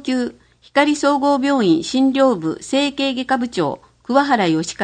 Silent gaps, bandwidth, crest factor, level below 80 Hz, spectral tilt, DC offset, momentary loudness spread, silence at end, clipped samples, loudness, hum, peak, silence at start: none; 9.8 kHz; 16 dB; -56 dBFS; -4.5 dB/octave; under 0.1%; 7 LU; 0 s; under 0.1%; -18 LUFS; none; 0 dBFS; 0 s